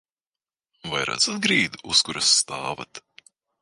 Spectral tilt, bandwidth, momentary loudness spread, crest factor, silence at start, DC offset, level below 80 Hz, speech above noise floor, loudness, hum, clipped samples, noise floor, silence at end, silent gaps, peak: -1 dB/octave; 11.5 kHz; 16 LU; 22 dB; 0.85 s; under 0.1%; -60 dBFS; over 66 dB; -21 LUFS; none; under 0.1%; under -90 dBFS; 0.65 s; none; -4 dBFS